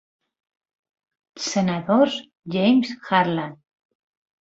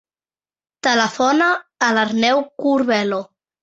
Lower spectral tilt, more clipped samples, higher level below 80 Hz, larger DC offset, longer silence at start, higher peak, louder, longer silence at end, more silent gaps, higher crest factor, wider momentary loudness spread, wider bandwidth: first, -5 dB/octave vs -3.5 dB/octave; neither; about the same, -64 dBFS vs -64 dBFS; neither; first, 1.35 s vs 0.85 s; about the same, -2 dBFS vs -2 dBFS; second, -21 LUFS vs -18 LUFS; first, 0.85 s vs 0.4 s; neither; about the same, 20 dB vs 16 dB; first, 11 LU vs 5 LU; about the same, 8 kHz vs 8 kHz